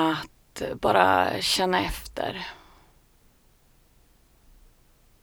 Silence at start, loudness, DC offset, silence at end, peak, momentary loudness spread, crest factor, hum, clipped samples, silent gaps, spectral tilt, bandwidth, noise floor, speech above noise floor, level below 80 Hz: 0 s; -25 LUFS; under 0.1%; 2.65 s; -2 dBFS; 16 LU; 26 dB; none; under 0.1%; none; -3.5 dB/octave; over 20 kHz; -60 dBFS; 35 dB; -48 dBFS